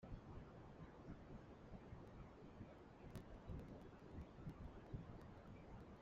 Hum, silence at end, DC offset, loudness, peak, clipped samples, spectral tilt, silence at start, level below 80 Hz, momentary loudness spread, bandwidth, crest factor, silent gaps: none; 0 s; under 0.1%; -59 LUFS; -40 dBFS; under 0.1%; -7.5 dB/octave; 0 s; -64 dBFS; 5 LU; 7.4 kHz; 18 dB; none